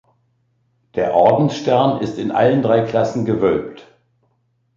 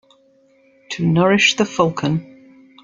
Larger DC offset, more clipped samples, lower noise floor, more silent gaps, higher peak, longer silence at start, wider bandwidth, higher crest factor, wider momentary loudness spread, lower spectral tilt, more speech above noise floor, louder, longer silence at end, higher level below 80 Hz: neither; neither; first, -65 dBFS vs -55 dBFS; neither; about the same, -2 dBFS vs -2 dBFS; about the same, 0.95 s vs 0.9 s; about the same, 7.6 kHz vs 7.6 kHz; about the same, 16 dB vs 18 dB; second, 8 LU vs 11 LU; first, -7.5 dB/octave vs -4.5 dB/octave; first, 49 dB vs 39 dB; about the same, -17 LUFS vs -17 LUFS; first, 0.95 s vs 0.6 s; about the same, -52 dBFS vs -56 dBFS